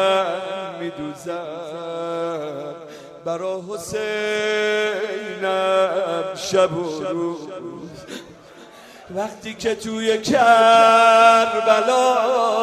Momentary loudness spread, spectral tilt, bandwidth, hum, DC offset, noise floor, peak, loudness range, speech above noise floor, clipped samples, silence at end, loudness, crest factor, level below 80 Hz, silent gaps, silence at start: 21 LU; -3.5 dB/octave; 14 kHz; none; under 0.1%; -43 dBFS; -2 dBFS; 13 LU; 25 dB; under 0.1%; 0 s; -19 LUFS; 18 dB; -62 dBFS; none; 0 s